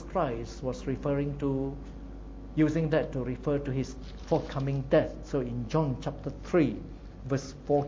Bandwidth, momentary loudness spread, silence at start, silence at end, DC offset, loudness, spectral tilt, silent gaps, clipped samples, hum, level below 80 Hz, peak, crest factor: 7.6 kHz; 15 LU; 0 s; 0 s; under 0.1%; -31 LUFS; -7.5 dB/octave; none; under 0.1%; none; -44 dBFS; -10 dBFS; 20 dB